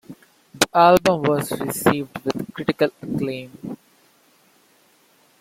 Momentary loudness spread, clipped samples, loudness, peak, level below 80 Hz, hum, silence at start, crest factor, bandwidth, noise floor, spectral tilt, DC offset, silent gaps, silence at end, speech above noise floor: 20 LU; under 0.1%; -20 LUFS; 0 dBFS; -56 dBFS; none; 0.1 s; 22 dB; 16.5 kHz; -58 dBFS; -4.5 dB/octave; under 0.1%; none; 1.65 s; 38 dB